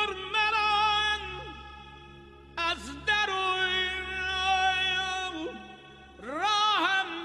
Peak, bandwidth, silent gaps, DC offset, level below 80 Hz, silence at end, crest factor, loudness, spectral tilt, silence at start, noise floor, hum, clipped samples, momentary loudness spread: -14 dBFS; 12.5 kHz; none; under 0.1%; -52 dBFS; 0 s; 16 dB; -27 LUFS; -2 dB/octave; 0 s; -50 dBFS; none; under 0.1%; 20 LU